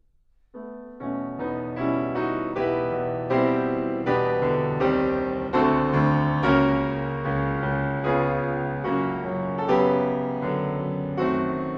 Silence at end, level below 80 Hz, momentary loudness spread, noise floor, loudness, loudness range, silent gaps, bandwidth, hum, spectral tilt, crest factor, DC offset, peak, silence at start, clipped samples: 0 s; -46 dBFS; 9 LU; -61 dBFS; -24 LUFS; 4 LU; none; 6.6 kHz; none; -9 dB/octave; 16 dB; under 0.1%; -8 dBFS; 0.55 s; under 0.1%